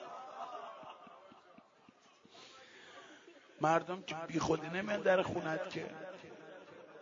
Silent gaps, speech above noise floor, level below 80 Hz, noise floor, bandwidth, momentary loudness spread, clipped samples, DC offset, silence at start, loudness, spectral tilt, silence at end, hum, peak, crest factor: none; 29 dB; -72 dBFS; -65 dBFS; 7.4 kHz; 24 LU; under 0.1%; under 0.1%; 0 s; -37 LUFS; -4 dB/octave; 0 s; none; -16 dBFS; 22 dB